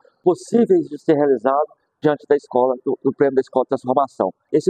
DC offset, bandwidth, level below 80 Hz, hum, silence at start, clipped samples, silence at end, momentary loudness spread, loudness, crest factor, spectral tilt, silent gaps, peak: under 0.1%; 9.6 kHz; -70 dBFS; none; 0.25 s; under 0.1%; 0 s; 5 LU; -19 LUFS; 16 dB; -7.5 dB/octave; none; -2 dBFS